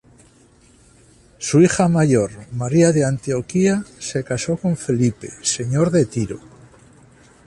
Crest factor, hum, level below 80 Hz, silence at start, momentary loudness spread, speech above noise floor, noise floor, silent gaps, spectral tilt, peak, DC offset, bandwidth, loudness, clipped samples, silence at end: 18 dB; none; -50 dBFS; 1.4 s; 11 LU; 34 dB; -52 dBFS; none; -6 dB/octave; -2 dBFS; under 0.1%; 11.5 kHz; -19 LUFS; under 0.1%; 1.1 s